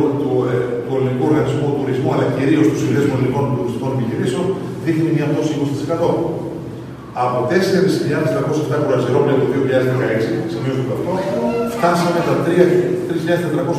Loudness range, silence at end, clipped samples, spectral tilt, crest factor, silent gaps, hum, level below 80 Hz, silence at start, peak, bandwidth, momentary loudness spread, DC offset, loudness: 2 LU; 0 s; under 0.1%; -7 dB/octave; 16 dB; none; none; -50 dBFS; 0 s; 0 dBFS; 14 kHz; 6 LU; under 0.1%; -17 LUFS